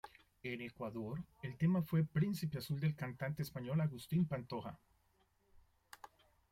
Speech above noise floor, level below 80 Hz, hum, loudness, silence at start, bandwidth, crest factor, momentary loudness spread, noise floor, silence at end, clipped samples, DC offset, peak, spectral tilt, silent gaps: 37 dB; -68 dBFS; none; -40 LUFS; 0.05 s; 16 kHz; 16 dB; 15 LU; -76 dBFS; 0.45 s; under 0.1%; under 0.1%; -24 dBFS; -7.5 dB/octave; none